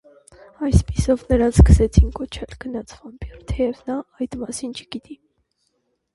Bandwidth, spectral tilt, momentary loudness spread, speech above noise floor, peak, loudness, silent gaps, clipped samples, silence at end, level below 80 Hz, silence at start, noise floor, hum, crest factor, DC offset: 11.5 kHz; -7 dB/octave; 21 LU; 52 dB; 0 dBFS; -20 LUFS; none; under 0.1%; 1 s; -24 dBFS; 0.6 s; -71 dBFS; none; 20 dB; under 0.1%